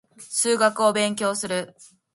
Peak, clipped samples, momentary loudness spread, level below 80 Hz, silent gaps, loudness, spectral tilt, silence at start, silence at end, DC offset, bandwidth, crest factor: -6 dBFS; under 0.1%; 9 LU; -70 dBFS; none; -22 LUFS; -2.5 dB/octave; 0.2 s; 0.3 s; under 0.1%; 12 kHz; 18 dB